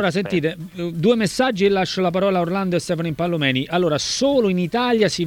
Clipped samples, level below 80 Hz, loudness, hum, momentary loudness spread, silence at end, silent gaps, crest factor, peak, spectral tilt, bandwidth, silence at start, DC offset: under 0.1%; -52 dBFS; -20 LUFS; none; 5 LU; 0 s; none; 14 dB; -4 dBFS; -5 dB/octave; 17 kHz; 0 s; under 0.1%